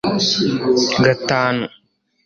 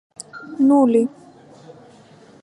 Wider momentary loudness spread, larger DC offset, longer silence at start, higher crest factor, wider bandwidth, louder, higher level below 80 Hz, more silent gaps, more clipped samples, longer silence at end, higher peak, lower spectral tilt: second, 6 LU vs 22 LU; neither; second, 0.05 s vs 0.35 s; about the same, 16 dB vs 16 dB; second, 7.4 kHz vs 11 kHz; about the same, -16 LUFS vs -17 LUFS; first, -52 dBFS vs -74 dBFS; neither; neither; second, 0.55 s vs 1.35 s; about the same, -2 dBFS vs -4 dBFS; second, -4.5 dB/octave vs -6.5 dB/octave